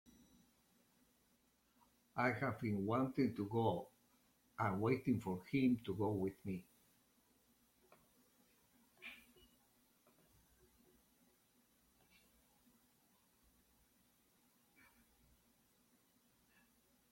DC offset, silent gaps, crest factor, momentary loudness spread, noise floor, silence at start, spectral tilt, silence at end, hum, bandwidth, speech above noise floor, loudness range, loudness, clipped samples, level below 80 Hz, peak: under 0.1%; none; 24 dB; 18 LU; -77 dBFS; 2.15 s; -7.5 dB/octave; 7.95 s; none; 16.5 kHz; 38 dB; 8 LU; -40 LUFS; under 0.1%; -76 dBFS; -22 dBFS